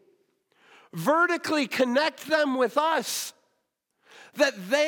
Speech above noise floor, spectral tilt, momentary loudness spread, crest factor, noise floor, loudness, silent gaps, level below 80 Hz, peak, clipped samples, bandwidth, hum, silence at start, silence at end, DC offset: 52 dB; -3 dB/octave; 9 LU; 18 dB; -77 dBFS; -25 LUFS; none; -80 dBFS; -8 dBFS; under 0.1%; 18 kHz; none; 0.95 s; 0 s; under 0.1%